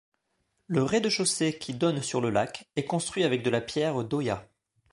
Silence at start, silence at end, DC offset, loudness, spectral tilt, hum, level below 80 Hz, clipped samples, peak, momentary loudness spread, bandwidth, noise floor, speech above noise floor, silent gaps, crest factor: 0.7 s; 0.5 s; under 0.1%; -28 LUFS; -4.5 dB/octave; none; -62 dBFS; under 0.1%; -10 dBFS; 6 LU; 11.5 kHz; -76 dBFS; 48 dB; none; 18 dB